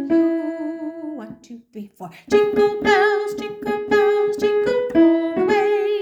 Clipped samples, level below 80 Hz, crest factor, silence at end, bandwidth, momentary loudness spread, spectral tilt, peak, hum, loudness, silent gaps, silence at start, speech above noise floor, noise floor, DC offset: under 0.1%; -56 dBFS; 16 dB; 0 s; 9 kHz; 20 LU; -5.5 dB/octave; -4 dBFS; none; -19 LUFS; none; 0 s; 20 dB; -39 dBFS; under 0.1%